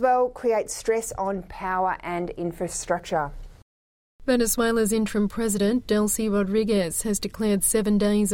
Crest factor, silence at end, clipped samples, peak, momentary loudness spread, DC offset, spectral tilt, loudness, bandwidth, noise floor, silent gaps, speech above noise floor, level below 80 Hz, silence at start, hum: 16 dB; 0 s; under 0.1%; -8 dBFS; 8 LU; under 0.1%; -4.5 dB/octave; -24 LUFS; 16.5 kHz; under -90 dBFS; 3.62-4.19 s; over 66 dB; -44 dBFS; 0 s; none